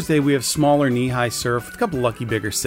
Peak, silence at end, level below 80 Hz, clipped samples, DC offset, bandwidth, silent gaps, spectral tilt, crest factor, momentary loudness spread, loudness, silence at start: -6 dBFS; 0 s; -46 dBFS; under 0.1%; under 0.1%; 16 kHz; none; -5 dB/octave; 14 dB; 7 LU; -20 LUFS; 0 s